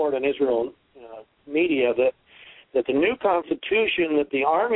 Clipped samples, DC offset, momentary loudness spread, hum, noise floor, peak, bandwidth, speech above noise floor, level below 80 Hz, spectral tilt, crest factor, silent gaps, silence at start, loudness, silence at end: under 0.1%; under 0.1%; 8 LU; none; -50 dBFS; -8 dBFS; 4.1 kHz; 28 dB; -60 dBFS; -8.5 dB/octave; 14 dB; none; 0 s; -23 LUFS; 0 s